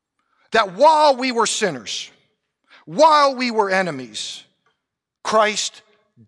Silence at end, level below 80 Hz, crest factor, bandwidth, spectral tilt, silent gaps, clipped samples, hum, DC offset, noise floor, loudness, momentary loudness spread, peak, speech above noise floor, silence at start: 0.6 s; -66 dBFS; 16 dB; 12 kHz; -2.5 dB/octave; none; under 0.1%; none; under 0.1%; -80 dBFS; -18 LUFS; 16 LU; -4 dBFS; 63 dB; 0.5 s